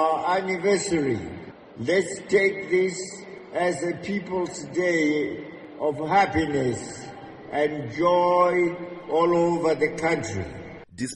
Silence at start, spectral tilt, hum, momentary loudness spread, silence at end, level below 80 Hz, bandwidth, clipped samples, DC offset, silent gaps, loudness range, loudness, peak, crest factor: 0 s; -5 dB/octave; none; 16 LU; 0 s; -54 dBFS; 11 kHz; under 0.1%; under 0.1%; none; 3 LU; -24 LUFS; -6 dBFS; 18 dB